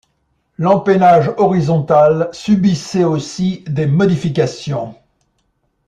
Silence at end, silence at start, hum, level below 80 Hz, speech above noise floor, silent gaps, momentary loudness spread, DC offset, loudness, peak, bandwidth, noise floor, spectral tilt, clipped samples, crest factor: 0.95 s; 0.6 s; none; -50 dBFS; 51 dB; none; 9 LU; under 0.1%; -14 LUFS; -2 dBFS; 9.6 kHz; -64 dBFS; -7 dB/octave; under 0.1%; 14 dB